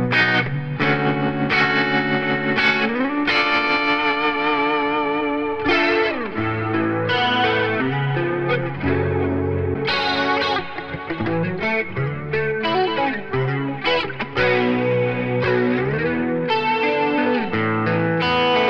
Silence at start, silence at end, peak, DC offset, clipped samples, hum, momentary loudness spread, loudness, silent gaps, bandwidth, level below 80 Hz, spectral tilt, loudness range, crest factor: 0 s; 0 s; -4 dBFS; under 0.1%; under 0.1%; none; 6 LU; -20 LUFS; none; 7.6 kHz; -48 dBFS; -7 dB/octave; 4 LU; 16 dB